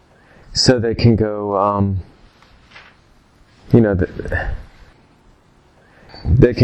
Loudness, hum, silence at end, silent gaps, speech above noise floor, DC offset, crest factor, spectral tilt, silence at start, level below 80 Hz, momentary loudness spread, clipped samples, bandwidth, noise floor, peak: -17 LUFS; none; 0 s; none; 37 dB; under 0.1%; 18 dB; -6 dB/octave; 0.5 s; -32 dBFS; 12 LU; under 0.1%; 9.4 kHz; -52 dBFS; 0 dBFS